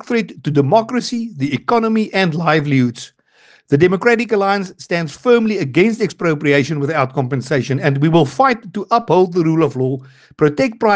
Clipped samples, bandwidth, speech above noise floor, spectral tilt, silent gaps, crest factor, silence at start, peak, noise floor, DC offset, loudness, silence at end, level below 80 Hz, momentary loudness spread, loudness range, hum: under 0.1%; 9.4 kHz; 35 dB; -6.5 dB/octave; none; 16 dB; 0.05 s; 0 dBFS; -50 dBFS; under 0.1%; -16 LUFS; 0 s; -56 dBFS; 7 LU; 1 LU; none